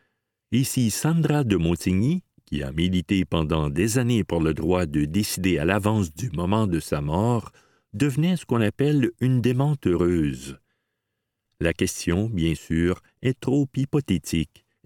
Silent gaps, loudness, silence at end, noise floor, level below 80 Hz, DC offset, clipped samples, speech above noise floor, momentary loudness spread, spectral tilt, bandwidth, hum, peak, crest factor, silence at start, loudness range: none; -24 LUFS; 0.4 s; -80 dBFS; -42 dBFS; under 0.1%; under 0.1%; 58 dB; 6 LU; -6 dB/octave; 18 kHz; none; -4 dBFS; 18 dB; 0.5 s; 3 LU